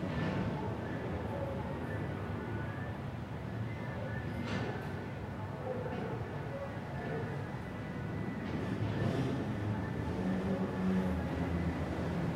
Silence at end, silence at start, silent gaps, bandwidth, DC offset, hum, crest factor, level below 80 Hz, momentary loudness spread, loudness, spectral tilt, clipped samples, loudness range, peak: 0 s; 0 s; none; 14 kHz; under 0.1%; none; 14 dB; -54 dBFS; 7 LU; -38 LUFS; -8 dB/octave; under 0.1%; 5 LU; -22 dBFS